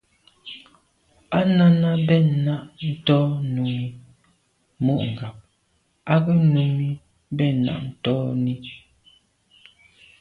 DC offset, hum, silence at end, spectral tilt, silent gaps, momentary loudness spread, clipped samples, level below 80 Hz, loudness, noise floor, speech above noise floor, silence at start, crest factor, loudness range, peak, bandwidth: under 0.1%; none; 1.45 s; -9.5 dB/octave; none; 20 LU; under 0.1%; -58 dBFS; -21 LUFS; -67 dBFS; 47 dB; 0.45 s; 18 dB; 5 LU; -4 dBFS; 4.7 kHz